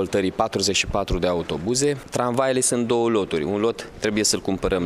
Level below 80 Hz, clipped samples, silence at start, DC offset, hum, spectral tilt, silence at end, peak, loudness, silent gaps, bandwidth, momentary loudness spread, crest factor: -40 dBFS; under 0.1%; 0 s; under 0.1%; none; -3.5 dB/octave; 0 s; -6 dBFS; -22 LUFS; none; 15.5 kHz; 5 LU; 16 dB